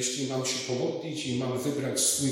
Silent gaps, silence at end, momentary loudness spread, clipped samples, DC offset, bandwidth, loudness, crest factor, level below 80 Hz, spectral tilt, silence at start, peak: none; 0 s; 7 LU; under 0.1%; under 0.1%; 16.5 kHz; -29 LUFS; 16 dB; -68 dBFS; -3.5 dB/octave; 0 s; -12 dBFS